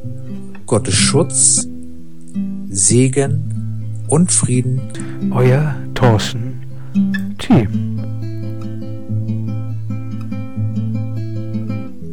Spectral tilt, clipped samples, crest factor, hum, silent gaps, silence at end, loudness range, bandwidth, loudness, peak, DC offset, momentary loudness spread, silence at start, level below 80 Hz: -4.5 dB/octave; under 0.1%; 18 dB; none; none; 0 s; 9 LU; 11.5 kHz; -17 LUFS; 0 dBFS; 5%; 15 LU; 0 s; -44 dBFS